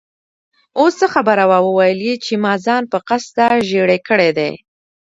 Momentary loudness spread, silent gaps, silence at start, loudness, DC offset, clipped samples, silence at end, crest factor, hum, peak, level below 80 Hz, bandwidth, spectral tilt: 7 LU; none; 0.75 s; -15 LUFS; under 0.1%; under 0.1%; 0.5 s; 16 dB; none; 0 dBFS; -62 dBFS; 8 kHz; -5 dB/octave